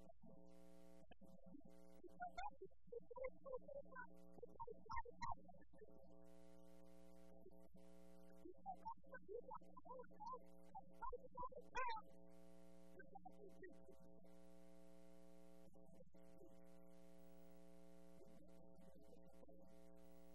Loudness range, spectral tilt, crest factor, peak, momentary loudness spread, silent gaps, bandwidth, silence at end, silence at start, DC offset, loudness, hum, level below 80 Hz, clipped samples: 12 LU; -5.5 dB/octave; 24 dB; -34 dBFS; 15 LU; none; 13 kHz; 0 s; 0 s; 0.1%; -60 LUFS; none; -74 dBFS; under 0.1%